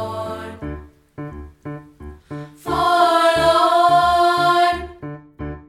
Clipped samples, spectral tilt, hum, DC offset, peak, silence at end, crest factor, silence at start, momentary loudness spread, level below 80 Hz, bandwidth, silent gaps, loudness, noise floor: under 0.1%; -4.5 dB/octave; none; under 0.1%; -4 dBFS; 0.1 s; 16 dB; 0 s; 21 LU; -42 dBFS; 15 kHz; none; -16 LUFS; -39 dBFS